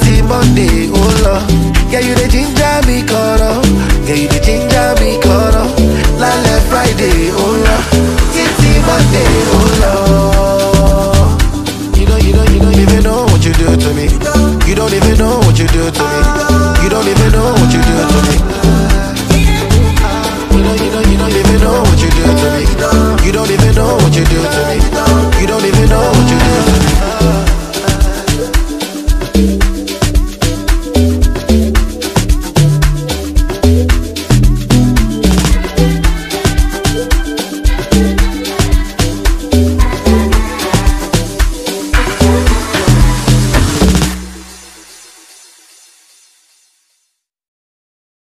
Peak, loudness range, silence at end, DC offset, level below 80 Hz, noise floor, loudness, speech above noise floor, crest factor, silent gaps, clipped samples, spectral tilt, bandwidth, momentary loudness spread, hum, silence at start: 0 dBFS; 4 LU; 3.65 s; 0.2%; -14 dBFS; -65 dBFS; -11 LUFS; 57 dB; 10 dB; none; under 0.1%; -5.5 dB/octave; 15.5 kHz; 6 LU; none; 0 s